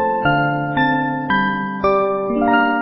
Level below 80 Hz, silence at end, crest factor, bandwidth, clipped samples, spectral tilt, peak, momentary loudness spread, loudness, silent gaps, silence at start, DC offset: -46 dBFS; 0 s; 14 dB; 5.8 kHz; under 0.1%; -11.5 dB/octave; -4 dBFS; 4 LU; -17 LUFS; none; 0 s; under 0.1%